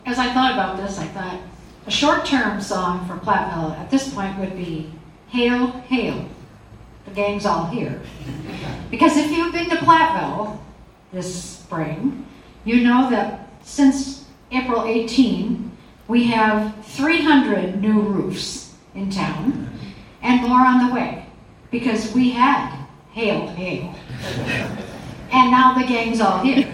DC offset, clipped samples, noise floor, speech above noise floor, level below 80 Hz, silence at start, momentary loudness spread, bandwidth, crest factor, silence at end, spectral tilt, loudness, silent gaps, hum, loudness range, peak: under 0.1%; under 0.1%; -44 dBFS; 25 dB; -46 dBFS; 0.05 s; 17 LU; 12 kHz; 20 dB; 0 s; -5 dB/octave; -19 LUFS; none; none; 5 LU; 0 dBFS